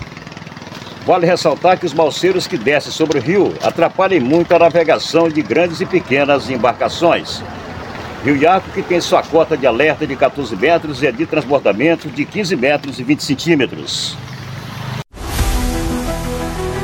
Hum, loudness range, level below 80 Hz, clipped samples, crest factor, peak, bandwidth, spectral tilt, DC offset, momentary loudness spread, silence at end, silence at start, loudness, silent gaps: none; 5 LU; -32 dBFS; under 0.1%; 14 dB; 0 dBFS; 17 kHz; -5 dB/octave; under 0.1%; 14 LU; 0 s; 0 s; -15 LUFS; none